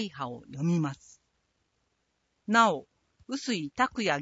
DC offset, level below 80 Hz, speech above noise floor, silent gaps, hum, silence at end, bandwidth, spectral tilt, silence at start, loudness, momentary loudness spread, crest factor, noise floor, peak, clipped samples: under 0.1%; -68 dBFS; 48 dB; none; none; 0 s; 8 kHz; -5 dB/octave; 0 s; -29 LUFS; 15 LU; 22 dB; -77 dBFS; -10 dBFS; under 0.1%